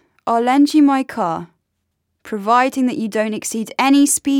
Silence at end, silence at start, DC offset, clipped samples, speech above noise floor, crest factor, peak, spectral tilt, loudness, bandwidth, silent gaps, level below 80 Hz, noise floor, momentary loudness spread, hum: 0 s; 0.25 s; under 0.1%; under 0.1%; 57 dB; 14 dB; -2 dBFS; -3.5 dB/octave; -16 LUFS; 16.5 kHz; none; -64 dBFS; -72 dBFS; 10 LU; none